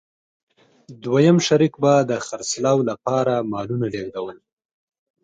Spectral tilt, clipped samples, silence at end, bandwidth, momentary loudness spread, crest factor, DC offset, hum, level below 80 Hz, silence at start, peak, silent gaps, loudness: -5.5 dB/octave; under 0.1%; 0.9 s; 9.4 kHz; 14 LU; 18 dB; under 0.1%; none; -62 dBFS; 0.9 s; -4 dBFS; none; -20 LUFS